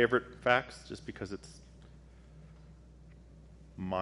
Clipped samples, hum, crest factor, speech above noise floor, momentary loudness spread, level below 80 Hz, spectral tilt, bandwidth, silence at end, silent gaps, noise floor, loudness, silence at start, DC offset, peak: under 0.1%; none; 26 dB; 22 dB; 27 LU; -58 dBFS; -5.5 dB/octave; 11.5 kHz; 0 s; none; -55 dBFS; -34 LUFS; 0 s; under 0.1%; -10 dBFS